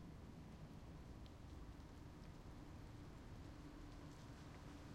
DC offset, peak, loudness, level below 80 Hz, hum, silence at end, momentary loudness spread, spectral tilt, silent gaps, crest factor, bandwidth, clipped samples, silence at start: under 0.1%; -44 dBFS; -59 LUFS; -62 dBFS; none; 0 s; 1 LU; -6.5 dB/octave; none; 14 dB; 15.5 kHz; under 0.1%; 0 s